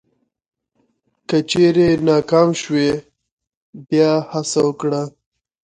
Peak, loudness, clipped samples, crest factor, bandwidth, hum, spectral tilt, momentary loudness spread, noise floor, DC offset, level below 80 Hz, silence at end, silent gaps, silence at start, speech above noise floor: 0 dBFS; -17 LUFS; under 0.1%; 18 dB; 9.4 kHz; none; -5.5 dB/octave; 9 LU; -66 dBFS; under 0.1%; -52 dBFS; 0.6 s; 3.32-3.37 s, 3.57-3.73 s; 1.3 s; 50 dB